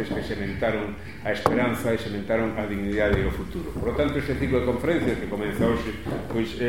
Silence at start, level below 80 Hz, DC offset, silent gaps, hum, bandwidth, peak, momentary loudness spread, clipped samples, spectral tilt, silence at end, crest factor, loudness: 0 s; -38 dBFS; 0.8%; none; none; 17 kHz; -2 dBFS; 7 LU; under 0.1%; -6.5 dB/octave; 0 s; 24 dB; -26 LUFS